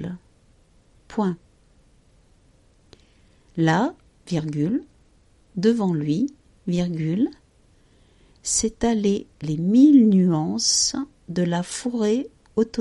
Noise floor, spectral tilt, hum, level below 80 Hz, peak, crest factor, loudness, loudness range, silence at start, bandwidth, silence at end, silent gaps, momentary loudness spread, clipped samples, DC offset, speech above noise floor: -57 dBFS; -5 dB/octave; none; -52 dBFS; -4 dBFS; 18 dB; -22 LUFS; 9 LU; 0 s; 11.5 kHz; 0 s; none; 14 LU; under 0.1%; under 0.1%; 37 dB